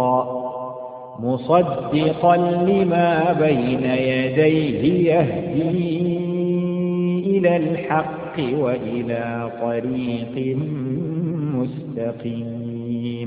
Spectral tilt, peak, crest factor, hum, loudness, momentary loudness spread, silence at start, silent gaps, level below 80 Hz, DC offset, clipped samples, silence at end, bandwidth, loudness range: -12.5 dB/octave; -2 dBFS; 18 dB; none; -21 LUFS; 10 LU; 0 s; none; -54 dBFS; under 0.1%; under 0.1%; 0 s; 4.9 kHz; 7 LU